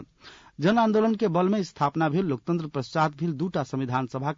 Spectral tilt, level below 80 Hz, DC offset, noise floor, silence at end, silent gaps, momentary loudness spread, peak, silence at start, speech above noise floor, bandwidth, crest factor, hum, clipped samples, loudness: -7.5 dB/octave; -62 dBFS; under 0.1%; -51 dBFS; 0.05 s; none; 7 LU; -12 dBFS; 0 s; 26 dB; 7.6 kHz; 14 dB; none; under 0.1%; -26 LUFS